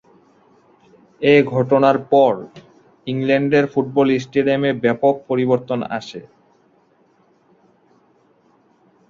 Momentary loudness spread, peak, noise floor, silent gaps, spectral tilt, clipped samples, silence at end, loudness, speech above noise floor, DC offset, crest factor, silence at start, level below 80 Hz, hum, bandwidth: 13 LU; -2 dBFS; -57 dBFS; none; -7.5 dB/octave; under 0.1%; 2.9 s; -17 LUFS; 41 dB; under 0.1%; 18 dB; 1.2 s; -62 dBFS; none; 7.2 kHz